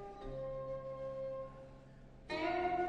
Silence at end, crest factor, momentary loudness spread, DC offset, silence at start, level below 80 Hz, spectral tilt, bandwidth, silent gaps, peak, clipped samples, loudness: 0 s; 16 dB; 21 LU; under 0.1%; 0 s; -58 dBFS; -6.5 dB/octave; 9.6 kHz; none; -26 dBFS; under 0.1%; -42 LUFS